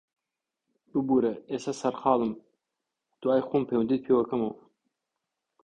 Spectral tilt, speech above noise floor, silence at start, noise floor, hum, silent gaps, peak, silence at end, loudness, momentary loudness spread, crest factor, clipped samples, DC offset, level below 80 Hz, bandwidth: -7 dB/octave; 61 dB; 0.95 s; -87 dBFS; none; none; -8 dBFS; 1.1 s; -28 LUFS; 9 LU; 20 dB; under 0.1%; under 0.1%; -68 dBFS; 9.6 kHz